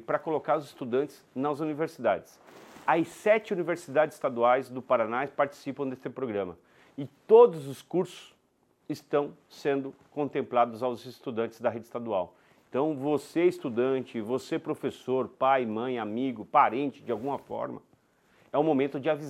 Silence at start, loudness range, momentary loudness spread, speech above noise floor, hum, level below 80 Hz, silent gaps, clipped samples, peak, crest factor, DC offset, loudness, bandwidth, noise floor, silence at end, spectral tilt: 0 s; 4 LU; 11 LU; 41 dB; none; -76 dBFS; none; under 0.1%; -8 dBFS; 22 dB; under 0.1%; -29 LUFS; 14 kHz; -69 dBFS; 0 s; -6.5 dB/octave